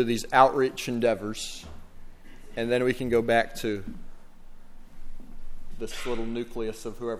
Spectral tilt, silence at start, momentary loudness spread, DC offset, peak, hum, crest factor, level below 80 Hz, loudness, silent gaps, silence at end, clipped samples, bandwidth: -4.5 dB/octave; 0 s; 20 LU; under 0.1%; -4 dBFS; none; 24 dB; -42 dBFS; -27 LUFS; none; 0 s; under 0.1%; 15.5 kHz